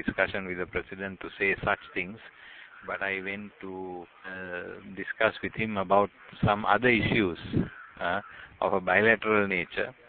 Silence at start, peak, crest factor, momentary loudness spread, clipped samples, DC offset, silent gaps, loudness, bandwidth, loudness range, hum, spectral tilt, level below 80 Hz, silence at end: 0 s; -6 dBFS; 22 dB; 18 LU; under 0.1%; under 0.1%; none; -28 LUFS; 4.6 kHz; 8 LU; none; -10 dB/octave; -54 dBFS; 0.15 s